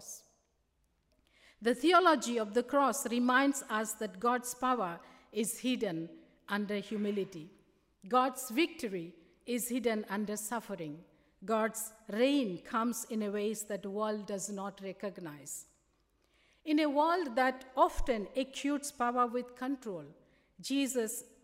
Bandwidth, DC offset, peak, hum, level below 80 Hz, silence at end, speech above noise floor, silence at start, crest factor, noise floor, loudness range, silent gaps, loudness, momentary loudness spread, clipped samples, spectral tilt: 16 kHz; under 0.1%; -12 dBFS; none; -56 dBFS; 0.2 s; 43 dB; 0 s; 22 dB; -76 dBFS; 7 LU; none; -33 LUFS; 14 LU; under 0.1%; -3.5 dB/octave